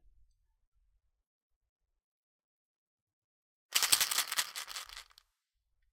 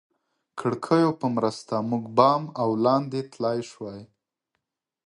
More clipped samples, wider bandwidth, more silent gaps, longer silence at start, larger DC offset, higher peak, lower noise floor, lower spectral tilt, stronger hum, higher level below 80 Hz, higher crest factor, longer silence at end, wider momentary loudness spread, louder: neither; first, 18 kHz vs 11.5 kHz; neither; first, 3.7 s vs 0.55 s; neither; about the same, -6 dBFS vs -4 dBFS; about the same, -83 dBFS vs -81 dBFS; second, 3 dB/octave vs -7 dB/octave; neither; second, -74 dBFS vs -68 dBFS; first, 34 dB vs 22 dB; about the same, 0.9 s vs 1 s; about the same, 19 LU vs 17 LU; second, -30 LUFS vs -24 LUFS